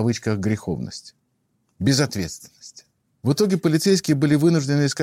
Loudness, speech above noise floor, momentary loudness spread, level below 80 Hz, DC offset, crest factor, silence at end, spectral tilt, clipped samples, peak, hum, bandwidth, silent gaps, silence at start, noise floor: -21 LUFS; 49 dB; 14 LU; -54 dBFS; under 0.1%; 16 dB; 0 s; -5.5 dB/octave; under 0.1%; -6 dBFS; none; 16.5 kHz; none; 0 s; -70 dBFS